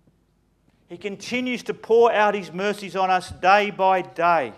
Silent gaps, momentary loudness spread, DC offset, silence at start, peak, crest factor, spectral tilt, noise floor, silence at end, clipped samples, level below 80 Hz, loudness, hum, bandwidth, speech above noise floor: none; 11 LU; under 0.1%; 0.9 s; -4 dBFS; 18 dB; -4.5 dB/octave; -64 dBFS; 0.05 s; under 0.1%; -60 dBFS; -21 LUFS; none; 13.5 kHz; 43 dB